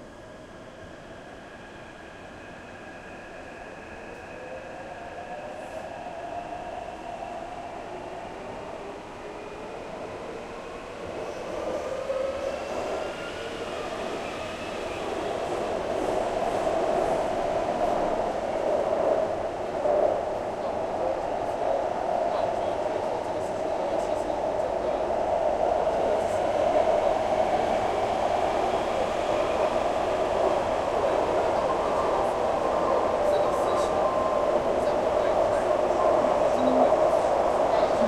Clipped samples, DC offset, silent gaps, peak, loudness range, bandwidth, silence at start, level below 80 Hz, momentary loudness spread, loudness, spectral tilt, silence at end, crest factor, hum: under 0.1%; under 0.1%; none; -10 dBFS; 14 LU; 12.5 kHz; 0 s; -50 dBFS; 17 LU; -27 LUFS; -5 dB/octave; 0 s; 18 dB; none